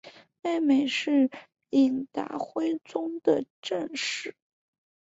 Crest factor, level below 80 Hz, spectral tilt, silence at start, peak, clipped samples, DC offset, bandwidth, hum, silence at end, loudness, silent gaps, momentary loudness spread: 18 dB; -72 dBFS; -4 dB/octave; 0.05 s; -10 dBFS; under 0.1%; under 0.1%; 8 kHz; none; 0.75 s; -28 LUFS; 3.50-3.63 s; 10 LU